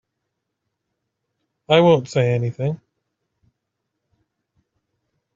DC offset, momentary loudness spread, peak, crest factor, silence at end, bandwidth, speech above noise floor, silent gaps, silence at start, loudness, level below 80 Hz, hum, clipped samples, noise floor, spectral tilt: under 0.1%; 12 LU; -2 dBFS; 22 dB; 2.6 s; 7.6 kHz; 61 dB; none; 1.7 s; -18 LUFS; -62 dBFS; none; under 0.1%; -78 dBFS; -7 dB/octave